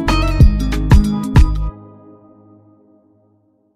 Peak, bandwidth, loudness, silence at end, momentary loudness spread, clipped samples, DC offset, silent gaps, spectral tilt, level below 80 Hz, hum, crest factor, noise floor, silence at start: 0 dBFS; 13.5 kHz; -14 LUFS; 2.05 s; 8 LU; under 0.1%; under 0.1%; none; -7 dB/octave; -18 dBFS; none; 14 dB; -57 dBFS; 0 s